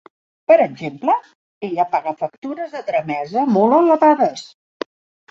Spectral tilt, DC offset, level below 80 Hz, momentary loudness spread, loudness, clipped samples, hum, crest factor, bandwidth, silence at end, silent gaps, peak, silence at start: -6.5 dB/octave; under 0.1%; -68 dBFS; 19 LU; -18 LUFS; under 0.1%; none; 16 dB; 7.8 kHz; 0.85 s; 1.35-1.61 s, 2.38-2.42 s; -2 dBFS; 0.5 s